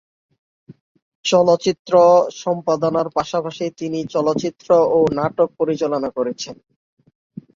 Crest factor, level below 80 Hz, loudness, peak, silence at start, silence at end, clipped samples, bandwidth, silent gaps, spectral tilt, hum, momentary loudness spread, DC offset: 16 dB; -58 dBFS; -18 LUFS; -2 dBFS; 1.25 s; 1 s; under 0.1%; 7.4 kHz; 1.79-1.85 s; -5.5 dB/octave; none; 11 LU; under 0.1%